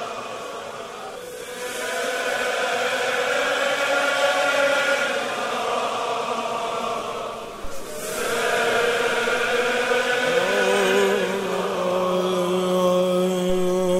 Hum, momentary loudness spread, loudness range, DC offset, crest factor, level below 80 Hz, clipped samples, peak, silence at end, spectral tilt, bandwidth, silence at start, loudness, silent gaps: none; 13 LU; 5 LU; under 0.1%; 18 dB; -52 dBFS; under 0.1%; -6 dBFS; 0 s; -3.5 dB/octave; 16 kHz; 0 s; -22 LUFS; none